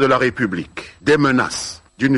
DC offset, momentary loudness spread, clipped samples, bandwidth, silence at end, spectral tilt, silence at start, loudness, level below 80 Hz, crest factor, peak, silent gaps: under 0.1%; 13 LU; under 0.1%; 11.5 kHz; 0 s; -5 dB/octave; 0 s; -18 LUFS; -48 dBFS; 14 dB; -4 dBFS; none